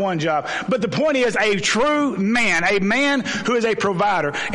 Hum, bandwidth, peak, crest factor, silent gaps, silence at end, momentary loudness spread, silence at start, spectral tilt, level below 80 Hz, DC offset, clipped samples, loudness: none; 11.5 kHz; -6 dBFS; 12 dB; none; 0 s; 4 LU; 0 s; -4 dB/octave; -52 dBFS; under 0.1%; under 0.1%; -19 LUFS